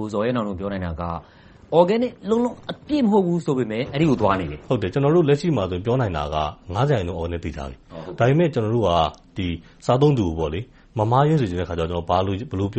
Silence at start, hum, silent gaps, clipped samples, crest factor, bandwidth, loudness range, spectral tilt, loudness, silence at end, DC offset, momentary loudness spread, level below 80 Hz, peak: 0 s; none; none; under 0.1%; 20 dB; 8.4 kHz; 2 LU; -7.5 dB/octave; -22 LUFS; 0 s; under 0.1%; 11 LU; -42 dBFS; -2 dBFS